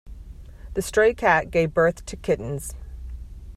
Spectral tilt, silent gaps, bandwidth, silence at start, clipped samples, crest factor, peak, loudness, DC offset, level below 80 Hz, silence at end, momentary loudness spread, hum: -5 dB/octave; none; 15 kHz; 0.05 s; under 0.1%; 20 dB; -4 dBFS; -22 LUFS; under 0.1%; -40 dBFS; 0 s; 20 LU; none